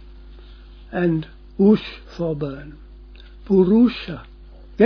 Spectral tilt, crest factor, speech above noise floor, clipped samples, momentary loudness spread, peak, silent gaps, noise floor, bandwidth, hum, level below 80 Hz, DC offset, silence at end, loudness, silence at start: -9.5 dB/octave; 18 dB; 23 dB; under 0.1%; 20 LU; -4 dBFS; none; -42 dBFS; 5.4 kHz; none; -42 dBFS; under 0.1%; 0 s; -20 LUFS; 0.05 s